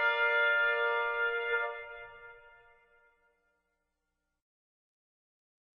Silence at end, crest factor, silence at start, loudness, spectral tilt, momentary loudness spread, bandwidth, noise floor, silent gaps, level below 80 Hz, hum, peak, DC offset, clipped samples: 3.4 s; 18 dB; 0 s; -29 LUFS; -2 dB/octave; 20 LU; 6.4 kHz; -84 dBFS; none; -70 dBFS; none; -18 dBFS; under 0.1%; under 0.1%